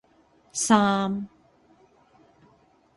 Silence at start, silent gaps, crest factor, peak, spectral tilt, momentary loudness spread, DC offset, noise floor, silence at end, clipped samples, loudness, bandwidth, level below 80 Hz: 0.55 s; none; 24 dB; -4 dBFS; -4 dB/octave; 15 LU; under 0.1%; -61 dBFS; 1.7 s; under 0.1%; -23 LUFS; 11.5 kHz; -64 dBFS